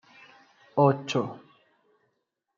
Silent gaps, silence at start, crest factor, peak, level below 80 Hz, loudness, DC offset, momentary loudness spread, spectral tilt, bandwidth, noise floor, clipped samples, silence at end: none; 0.75 s; 24 dB; -6 dBFS; -78 dBFS; -26 LUFS; under 0.1%; 15 LU; -6.5 dB/octave; 7.4 kHz; -79 dBFS; under 0.1%; 1.2 s